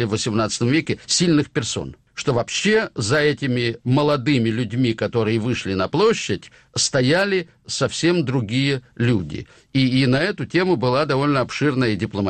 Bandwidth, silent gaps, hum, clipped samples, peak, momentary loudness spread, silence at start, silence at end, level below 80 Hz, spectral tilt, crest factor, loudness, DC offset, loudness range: 9.4 kHz; none; none; under 0.1%; -6 dBFS; 7 LU; 0 s; 0 s; -50 dBFS; -5 dB/octave; 12 dB; -20 LUFS; under 0.1%; 1 LU